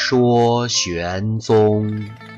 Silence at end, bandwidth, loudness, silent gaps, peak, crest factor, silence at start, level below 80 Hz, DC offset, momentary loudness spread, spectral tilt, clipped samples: 0 s; 8 kHz; -17 LUFS; none; -6 dBFS; 10 dB; 0 s; -48 dBFS; under 0.1%; 8 LU; -5 dB/octave; under 0.1%